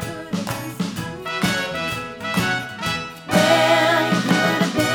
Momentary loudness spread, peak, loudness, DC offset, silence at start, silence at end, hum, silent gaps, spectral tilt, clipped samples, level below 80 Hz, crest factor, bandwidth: 12 LU; -2 dBFS; -20 LUFS; under 0.1%; 0 s; 0 s; none; none; -4.5 dB/octave; under 0.1%; -50 dBFS; 18 dB; over 20 kHz